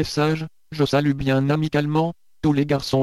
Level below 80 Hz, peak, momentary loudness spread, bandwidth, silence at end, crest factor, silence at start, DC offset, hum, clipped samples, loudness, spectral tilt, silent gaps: -46 dBFS; -6 dBFS; 6 LU; 13 kHz; 0 s; 14 dB; 0 s; 0.3%; none; under 0.1%; -22 LUFS; -6.5 dB/octave; none